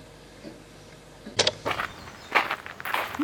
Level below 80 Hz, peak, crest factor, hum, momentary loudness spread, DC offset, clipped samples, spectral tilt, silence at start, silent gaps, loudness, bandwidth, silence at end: -58 dBFS; -6 dBFS; 24 dB; none; 23 LU; under 0.1%; under 0.1%; -2 dB/octave; 0 s; none; -27 LUFS; 19 kHz; 0 s